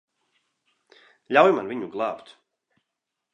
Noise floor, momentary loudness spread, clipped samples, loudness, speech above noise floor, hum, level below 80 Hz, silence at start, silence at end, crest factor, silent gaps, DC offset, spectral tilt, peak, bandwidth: -83 dBFS; 13 LU; under 0.1%; -22 LUFS; 61 dB; none; -78 dBFS; 1.3 s; 1.15 s; 24 dB; none; under 0.1%; -6 dB/octave; -2 dBFS; 9 kHz